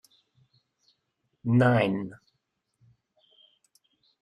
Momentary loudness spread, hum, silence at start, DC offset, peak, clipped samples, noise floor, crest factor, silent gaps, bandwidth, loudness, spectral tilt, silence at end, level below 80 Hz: 16 LU; none; 1.45 s; under 0.1%; -12 dBFS; under 0.1%; -79 dBFS; 20 dB; none; 9.8 kHz; -25 LUFS; -8.5 dB/octave; 2.05 s; -66 dBFS